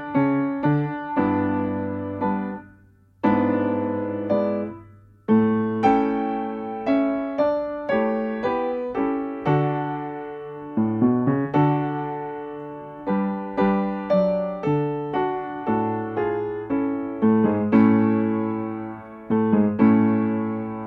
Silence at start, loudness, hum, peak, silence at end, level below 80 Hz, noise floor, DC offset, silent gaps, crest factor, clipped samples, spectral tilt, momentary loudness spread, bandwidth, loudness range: 0 s; -23 LUFS; none; -4 dBFS; 0 s; -56 dBFS; -54 dBFS; under 0.1%; none; 18 dB; under 0.1%; -10 dB/octave; 11 LU; 5 kHz; 4 LU